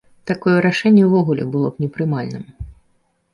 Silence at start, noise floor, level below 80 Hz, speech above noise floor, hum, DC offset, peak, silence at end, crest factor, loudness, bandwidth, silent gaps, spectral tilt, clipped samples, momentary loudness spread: 0.25 s; -63 dBFS; -46 dBFS; 46 dB; none; under 0.1%; -2 dBFS; 0.6 s; 16 dB; -17 LUFS; 11 kHz; none; -8 dB/octave; under 0.1%; 21 LU